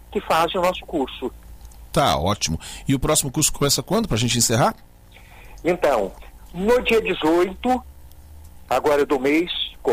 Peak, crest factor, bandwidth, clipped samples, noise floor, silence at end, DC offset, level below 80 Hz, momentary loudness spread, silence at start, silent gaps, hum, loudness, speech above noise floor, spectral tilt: -6 dBFS; 16 dB; 16 kHz; under 0.1%; -46 dBFS; 0 s; under 0.1%; -40 dBFS; 8 LU; 0.1 s; none; none; -21 LUFS; 25 dB; -4 dB/octave